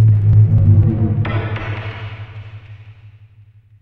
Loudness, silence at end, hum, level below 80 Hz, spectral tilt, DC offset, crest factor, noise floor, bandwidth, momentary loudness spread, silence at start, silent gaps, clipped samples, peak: -15 LUFS; 0.75 s; none; -32 dBFS; -10.5 dB/octave; under 0.1%; 14 dB; -46 dBFS; 3.9 kHz; 23 LU; 0 s; none; under 0.1%; -2 dBFS